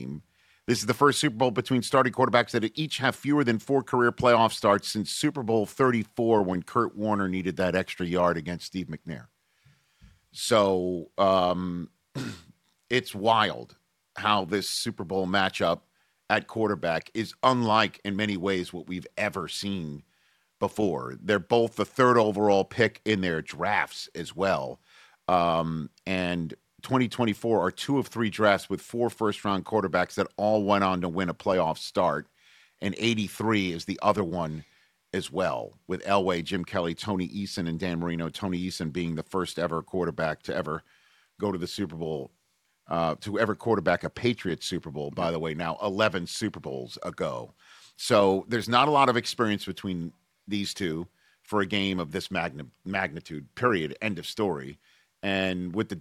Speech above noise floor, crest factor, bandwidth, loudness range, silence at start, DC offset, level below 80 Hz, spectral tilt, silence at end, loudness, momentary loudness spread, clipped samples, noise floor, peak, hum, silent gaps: 45 dB; 22 dB; 15.5 kHz; 6 LU; 0 s; under 0.1%; -60 dBFS; -5 dB/octave; 0 s; -27 LUFS; 12 LU; under 0.1%; -72 dBFS; -4 dBFS; none; none